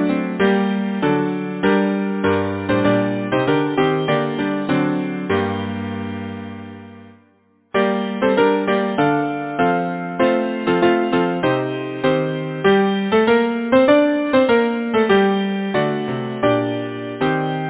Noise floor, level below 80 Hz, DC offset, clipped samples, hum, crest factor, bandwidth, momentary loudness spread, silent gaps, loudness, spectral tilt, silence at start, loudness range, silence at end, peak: -57 dBFS; -50 dBFS; under 0.1%; under 0.1%; none; 18 dB; 4 kHz; 9 LU; none; -18 LUFS; -10.5 dB/octave; 0 s; 6 LU; 0 s; 0 dBFS